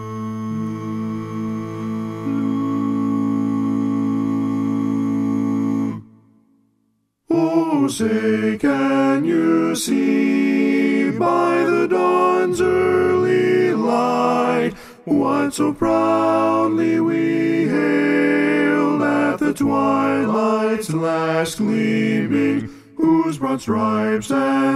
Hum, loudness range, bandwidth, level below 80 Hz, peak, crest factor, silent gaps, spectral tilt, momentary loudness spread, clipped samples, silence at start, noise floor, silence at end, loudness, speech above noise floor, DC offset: none; 5 LU; 14.5 kHz; -56 dBFS; -4 dBFS; 14 dB; none; -6 dB/octave; 9 LU; under 0.1%; 0 s; -67 dBFS; 0 s; -19 LUFS; 50 dB; under 0.1%